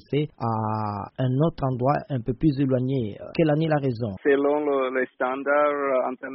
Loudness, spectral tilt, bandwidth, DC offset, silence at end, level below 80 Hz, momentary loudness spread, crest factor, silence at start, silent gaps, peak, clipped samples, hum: -24 LUFS; -7 dB/octave; 5.8 kHz; under 0.1%; 0 s; -50 dBFS; 6 LU; 16 dB; 0.1 s; none; -8 dBFS; under 0.1%; none